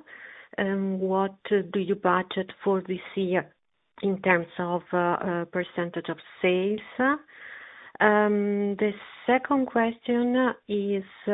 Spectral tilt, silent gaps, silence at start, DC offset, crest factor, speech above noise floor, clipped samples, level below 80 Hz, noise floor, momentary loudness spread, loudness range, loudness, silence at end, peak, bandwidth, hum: -9.5 dB/octave; none; 0.1 s; under 0.1%; 22 dB; 21 dB; under 0.1%; -68 dBFS; -47 dBFS; 10 LU; 3 LU; -26 LUFS; 0 s; -4 dBFS; 4 kHz; none